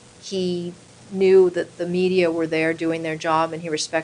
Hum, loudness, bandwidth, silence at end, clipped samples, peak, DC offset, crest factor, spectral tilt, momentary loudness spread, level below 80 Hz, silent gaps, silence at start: none; -21 LUFS; 10.5 kHz; 0 s; under 0.1%; -6 dBFS; under 0.1%; 16 dB; -5 dB/octave; 12 LU; -64 dBFS; none; 0.2 s